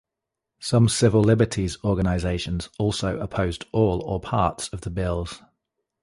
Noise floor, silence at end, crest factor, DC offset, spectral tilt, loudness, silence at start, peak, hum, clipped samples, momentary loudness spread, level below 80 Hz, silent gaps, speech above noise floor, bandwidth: -85 dBFS; 0.65 s; 18 dB; under 0.1%; -6 dB/octave; -23 LUFS; 0.6 s; -6 dBFS; none; under 0.1%; 12 LU; -38 dBFS; none; 62 dB; 11.5 kHz